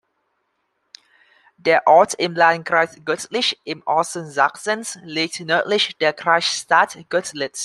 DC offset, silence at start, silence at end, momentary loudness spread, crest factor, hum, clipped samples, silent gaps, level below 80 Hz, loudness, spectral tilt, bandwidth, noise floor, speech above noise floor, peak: under 0.1%; 1.65 s; 0 s; 10 LU; 18 dB; none; under 0.1%; none; -72 dBFS; -19 LUFS; -2.5 dB/octave; 13 kHz; -71 dBFS; 52 dB; -2 dBFS